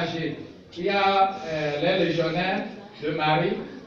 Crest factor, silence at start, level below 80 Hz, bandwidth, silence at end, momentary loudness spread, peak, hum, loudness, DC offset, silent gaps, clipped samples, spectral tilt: 16 dB; 0 s; -60 dBFS; 7.2 kHz; 0 s; 12 LU; -10 dBFS; none; -25 LUFS; under 0.1%; none; under 0.1%; -6 dB/octave